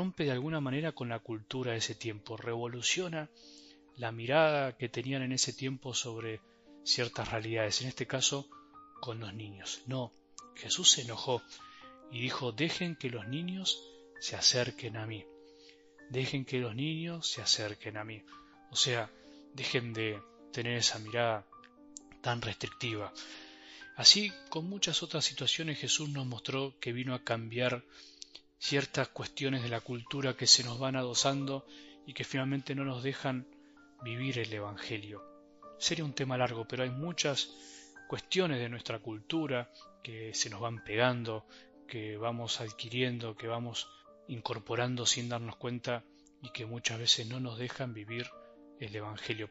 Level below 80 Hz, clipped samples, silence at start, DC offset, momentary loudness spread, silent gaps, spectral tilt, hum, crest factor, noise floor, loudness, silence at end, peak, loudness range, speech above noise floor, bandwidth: -70 dBFS; under 0.1%; 0 s; under 0.1%; 16 LU; none; -3 dB/octave; none; 28 dB; -59 dBFS; -33 LUFS; 0 s; -6 dBFS; 7 LU; 25 dB; 8 kHz